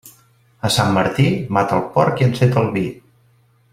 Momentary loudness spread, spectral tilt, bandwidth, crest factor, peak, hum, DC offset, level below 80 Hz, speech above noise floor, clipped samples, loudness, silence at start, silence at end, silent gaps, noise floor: 7 LU; -6 dB/octave; 15.5 kHz; 16 dB; -2 dBFS; none; under 0.1%; -50 dBFS; 39 dB; under 0.1%; -17 LUFS; 0.05 s; 0.75 s; none; -56 dBFS